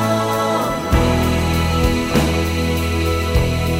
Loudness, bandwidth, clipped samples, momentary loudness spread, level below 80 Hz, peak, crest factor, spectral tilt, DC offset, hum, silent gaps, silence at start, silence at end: -18 LUFS; 16.5 kHz; under 0.1%; 2 LU; -24 dBFS; -2 dBFS; 16 dB; -5.5 dB/octave; under 0.1%; none; none; 0 s; 0 s